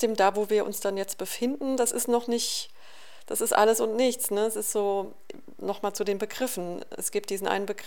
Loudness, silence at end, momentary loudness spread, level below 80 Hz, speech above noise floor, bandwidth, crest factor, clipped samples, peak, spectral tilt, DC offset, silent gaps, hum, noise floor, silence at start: -27 LUFS; 0 s; 11 LU; -74 dBFS; 25 dB; over 20 kHz; 20 dB; under 0.1%; -8 dBFS; -2.5 dB/octave; 0.8%; none; none; -52 dBFS; 0 s